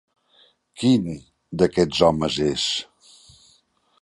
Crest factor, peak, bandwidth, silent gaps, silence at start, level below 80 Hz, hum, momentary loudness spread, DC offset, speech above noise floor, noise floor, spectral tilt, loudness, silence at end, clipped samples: 20 dB; -2 dBFS; 11.5 kHz; none; 0.8 s; -50 dBFS; none; 16 LU; under 0.1%; 41 dB; -62 dBFS; -5 dB/octave; -21 LUFS; 1.2 s; under 0.1%